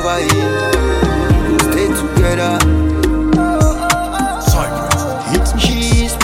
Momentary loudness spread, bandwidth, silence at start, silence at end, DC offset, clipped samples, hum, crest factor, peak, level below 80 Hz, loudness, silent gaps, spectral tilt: 3 LU; 16.5 kHz; 0 s; 0 s; under 0.1%; under 0.1%; none; 14 dB; 0 dBFS; -20 dBFS; -14 LUFS; none; -5 dB/octave